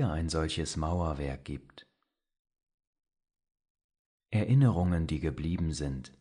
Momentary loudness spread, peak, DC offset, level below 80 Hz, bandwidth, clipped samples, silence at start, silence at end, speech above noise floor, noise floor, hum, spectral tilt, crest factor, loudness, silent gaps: 13 LU; -14 dBFS; under 0.1%; -44 dBFS; 10.5 kHz; under 0.1%; 0 s; 0.15 s; 50 dB; -80 dBFS; none; -6.5 dB/octave; 20 dB; -31 LUFS; 2.39-2.45 s, 2.74-2.78 s, 2.87-2.93 s, 3.70-3.75 s, 3.84-3.89 s, 3.99-4.18 s